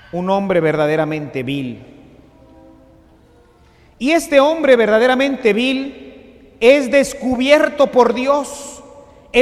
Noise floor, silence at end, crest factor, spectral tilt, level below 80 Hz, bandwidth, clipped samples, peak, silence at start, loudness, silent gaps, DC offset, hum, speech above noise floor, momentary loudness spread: -49 dBFS; 0 s; 16 dB; -5 dB/octave; -50 dBFS; 14.5 kHz; under 0.1%; 0 dBFS; 0.15 s; -15 LUFS; none; under 0.1%; none; 34 dB; 12 LU